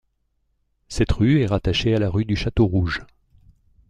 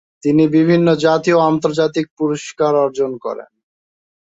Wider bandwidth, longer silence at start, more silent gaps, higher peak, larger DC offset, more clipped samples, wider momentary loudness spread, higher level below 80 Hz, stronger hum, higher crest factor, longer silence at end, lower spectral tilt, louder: first, 10.5 kHz vs 8 kHz; first, 0.9 s vs 0.25 s; second, none vs 2.11-2.17 s; second, -6 dBFS vs -2 dBFS; neither; neither; about the same, 8 LU vs 9 LU; first, -34 dBFS vs -58 dBFS; neither; about the same, 16 dB vs 14 dB; about the same, 0.85 s vs 0.9 s; about the same, -6.5 dB/octave vs -6.5 dB/octave; second, -21 LUFS vs -15 LUFS